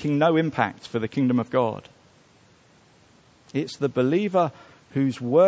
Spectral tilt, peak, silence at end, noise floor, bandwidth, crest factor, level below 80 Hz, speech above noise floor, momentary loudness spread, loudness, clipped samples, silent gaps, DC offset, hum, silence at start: -7.5 dB/octave; -4 dBFS; 0 s; -56 dBFS; 8 kHz; 20 dB; -62 dBFS; 34 dB; 9 LU; -24 LUFS; under 0.1%; none; under 0.1%; none; 0 s